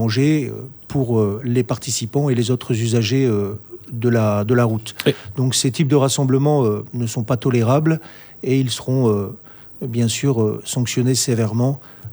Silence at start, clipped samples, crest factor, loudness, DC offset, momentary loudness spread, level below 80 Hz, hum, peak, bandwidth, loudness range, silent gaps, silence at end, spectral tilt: 0 s; under 0.1%; 16 dB; -19 LUFS; under 0.1%; 10 LU; -56 dBFS; none; -2 dBFS; over 20 kHz; 2 LU; none; 0 s; -5.5 dB/octave